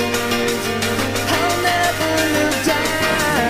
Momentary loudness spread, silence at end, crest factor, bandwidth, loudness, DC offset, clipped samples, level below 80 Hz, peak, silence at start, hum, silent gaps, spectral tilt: 3 LU; 0 s; 14 dB; 16 kHz; -17 LUFS; under 0.1%; under 0.1%; -40 dBFS; -4 dBFS; 0 s; none; none; -3 dB/octave